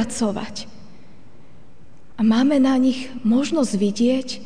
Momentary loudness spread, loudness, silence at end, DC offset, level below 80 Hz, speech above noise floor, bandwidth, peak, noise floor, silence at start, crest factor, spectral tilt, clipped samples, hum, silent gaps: 14 LU; -20 LUFS; 0 s; 2%; -54 dBFS; 31 dB; 10 kHz; -8 dBFS; -50 dBFS; 0 s; 14 dB; -5 dB/octave; under 0.1%; none; none